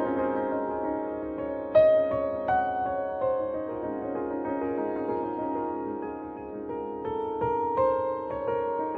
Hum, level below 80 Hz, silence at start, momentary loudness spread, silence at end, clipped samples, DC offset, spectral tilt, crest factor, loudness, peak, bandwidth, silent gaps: none; -56 dBFS; 0 s; 9 LU; 0 s; under 0.1%; under 0.1%; -9.5 dB/octave; 18 dB; -29 LUFS; -10 dBFS; 4.8 kHz; none